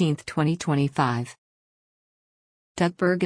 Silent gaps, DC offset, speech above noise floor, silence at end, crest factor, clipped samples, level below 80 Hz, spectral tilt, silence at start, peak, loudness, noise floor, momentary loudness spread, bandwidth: 1.38-2.75 s; under 0.1%; over 66 dB; 0 s; 18 dB; under 0.1%; -62 dBFS; -6.5 dB/octave; 0 s; -8 dBFS; -25 LUFS; under -90 dBFS; 10 LU; 10.5 kHz